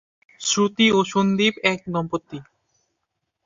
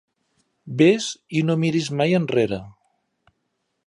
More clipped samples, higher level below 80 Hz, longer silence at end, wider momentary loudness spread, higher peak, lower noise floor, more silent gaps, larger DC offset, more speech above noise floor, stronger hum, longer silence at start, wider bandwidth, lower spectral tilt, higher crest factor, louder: neither; about the same, -60 dBFS vs -60 dBFS; about the same, 1.05 s vs 1.15 s; first, 13 LU vs 8 LU; about the same, -2 dBFS vs -4 dBFS; first, -78 dBFS vs -74 dBFS; neither; neither; about the same, 57 dB vs 54 dB; neither; second, 0.4 s vs 0.65 s; second, 7.8 kHz vs 11 kHz; second, -4 dB/octave vs -6 dB/octave; about the same, 20 dB vs 20 dB; about the same, -20 LUFS vs -21 LUFS